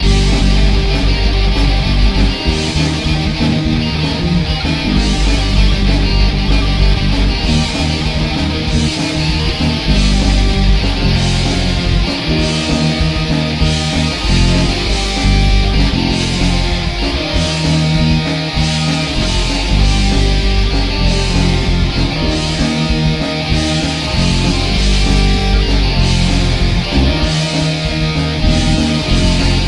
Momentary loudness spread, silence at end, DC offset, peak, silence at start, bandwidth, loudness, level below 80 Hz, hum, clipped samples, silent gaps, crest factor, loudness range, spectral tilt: 3 LU; 0 s; under 0.1%; 0 dBFS; 0 s; 11.5 kHz; -14 LUFS; -16 dBFS; none; under 0.1%; none; 12 dB; 1 LU; -5 dB/octave